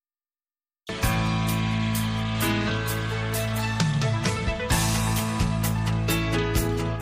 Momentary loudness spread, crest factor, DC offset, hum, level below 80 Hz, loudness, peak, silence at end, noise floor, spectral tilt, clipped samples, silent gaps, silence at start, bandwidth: 3 LU; 16 dB; under 0.1%; none; -36 dBFS; -25 LUFS; -8 dBFS; 0 s; under -90 dBFS; -5 dB/octave; under 0.1%; none; 0.85 s; 15.5 kHz